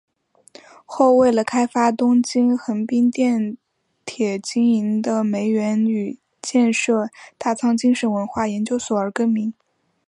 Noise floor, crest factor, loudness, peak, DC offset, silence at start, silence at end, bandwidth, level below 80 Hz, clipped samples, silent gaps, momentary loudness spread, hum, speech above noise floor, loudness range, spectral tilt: -49 dBFS; 16 dB; -19 LUFS; -4 dBFS; under 0.1%; 0.9 s; 0.55 s; 11 kHz; -62 dBFS; under 0.1%; none; 11 LU; none; 31 dB; 3 LU; -5 dB/octave